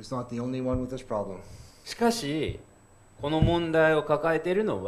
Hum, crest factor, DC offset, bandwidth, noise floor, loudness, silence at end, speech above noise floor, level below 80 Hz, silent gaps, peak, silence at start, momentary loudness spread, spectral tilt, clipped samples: none; 18 dB; under 0.1%; 14.5 kHz; -56 dBFS; -27 LUFS; 0 s; 29 dB; -44 dBFS; none; -10 dBFS; 0 s; 15 LU; -6 dB/octave; under 0.1%